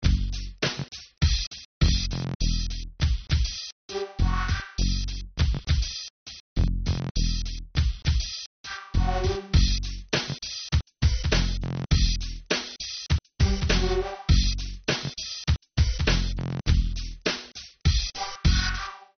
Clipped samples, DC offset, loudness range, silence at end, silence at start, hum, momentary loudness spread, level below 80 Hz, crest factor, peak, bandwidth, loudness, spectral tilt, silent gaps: under 0.1%; under 0.1%; 3 LU; 0.15 s; 0 s; none; 10 LU; -28 dBFS; 18 dB; -8 dBFS; 6.6 kHz; -27 LUFS; -4.5 dB/octave; 1.47-1.51 s, 1.65-1.81 s, 2.35-2.40 s, 3.72-3.89 s, 6.10-6.26 s, 6.40-6.56 s, 7.11-7.15 s, 8.46-8.64 s